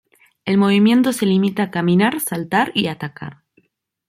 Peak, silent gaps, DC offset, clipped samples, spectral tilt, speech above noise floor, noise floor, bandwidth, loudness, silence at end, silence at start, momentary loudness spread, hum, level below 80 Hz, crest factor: -4 dBFS; none; under 0.1%; under 0.1%; -5.5 dB/octave; 45 dB; -62 dBFS; 16 kHz; -17 LUFS; 0.75 s; 0.45 s; 16 LU; none; -60 dBFS; 14 dB